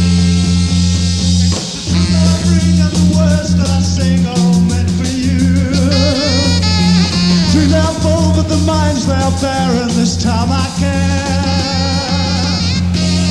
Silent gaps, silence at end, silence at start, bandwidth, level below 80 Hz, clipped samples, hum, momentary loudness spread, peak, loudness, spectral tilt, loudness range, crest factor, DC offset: none; 0 s; 0 s; 11.5 kHz; -26 dBFS; under 0.1%; none; 4 LU; 0 dBFS; -13 LUFS; -5.5 dB/octave; 2 LU; 12 dB; under 0.1%